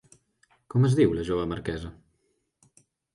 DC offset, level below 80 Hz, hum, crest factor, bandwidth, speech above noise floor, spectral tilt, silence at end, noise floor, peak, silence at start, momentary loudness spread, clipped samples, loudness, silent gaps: under 0.1%; -48 dBFS; none; 20 dB; 11 kHz; 49 dB; -8 dB/octave; 1.2 s; -74 dBFS; -10 dBFS; 0.75 s; 15 LU; under 0.1%; -26 LUFS; none